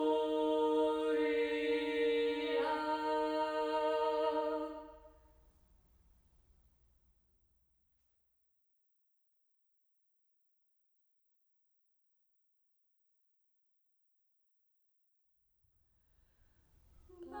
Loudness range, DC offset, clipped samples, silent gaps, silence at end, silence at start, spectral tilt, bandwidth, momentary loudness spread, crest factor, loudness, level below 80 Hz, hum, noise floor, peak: 9 LU; under 0.1%; under 0.1%; none; 0 s; 0 s; -4.5 dB/octave; over 20 kHz; 5 LU; 18 dB; -35 LUFS; -72 dBFS; none; -78 dBFS; -22 dBFS